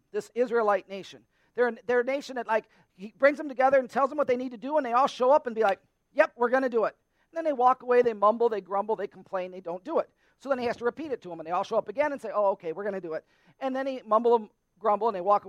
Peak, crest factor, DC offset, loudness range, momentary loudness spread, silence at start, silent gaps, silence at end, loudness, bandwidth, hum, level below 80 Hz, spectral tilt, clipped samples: -6 dBFS; 20 dB; under 0.1%; 5 LU; 13 LU; 0.15 s; none; 0 s; -27 LUFS; 10.5 kHz; none; -74 dBFS; -5.5 dB/octave; under 0.1%